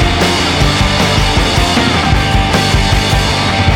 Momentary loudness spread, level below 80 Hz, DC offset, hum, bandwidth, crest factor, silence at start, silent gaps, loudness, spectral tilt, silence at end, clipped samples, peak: 1 LU; -18 dBFS; under 0.1%; none; 17 kHz; 10 dB; 0 s; none; -11 LUFS; -4.5 dB/octave; 0 s; under 0.1%; 0 dBFS